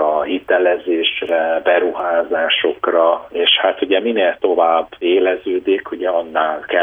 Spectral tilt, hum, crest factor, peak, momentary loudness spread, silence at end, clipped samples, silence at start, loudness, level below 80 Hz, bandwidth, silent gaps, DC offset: -5.5 dB/octave; none; 14 dB; -2 dBFS; 5 LU; 0 s; under 0.1%; 0 s; -16 LUFS; -58 dBFS; 3.9 kHz; none; under 0.1%